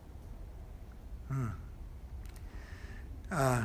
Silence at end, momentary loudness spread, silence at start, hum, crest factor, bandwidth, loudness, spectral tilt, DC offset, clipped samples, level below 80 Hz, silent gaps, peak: 0 s; 15 LU; 0 s; none; 22 dB; 15.5 kHz; -42 LUFS; -6 dB/octave; under 0.1%; under 0.1%; -46 dBFS; none; -16 dBFS